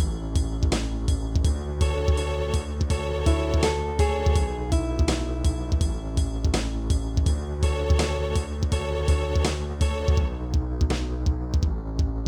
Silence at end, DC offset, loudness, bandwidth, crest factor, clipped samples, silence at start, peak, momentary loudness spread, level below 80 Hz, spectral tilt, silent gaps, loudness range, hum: 0 s; under 0.1%; -25 LUFS; 11.5 kHz; 14 dB; under 0.1%; 0 s; -8 dBFS; 4 LU; -26 dBFS; -6 dB/octave; none; 1 LU; none